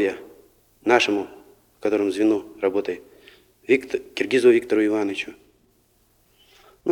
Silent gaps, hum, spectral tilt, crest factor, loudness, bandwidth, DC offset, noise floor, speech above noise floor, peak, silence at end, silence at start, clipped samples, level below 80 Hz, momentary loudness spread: none; none; -4.5 dB/octave; 20 dB; -22 LUFS; 14 kHz; under 0.1%; -62 dBFS; 41 dB; -2 dBFS; 0 s; 0 s; under 0.1%; -64 dBFS; 16 LU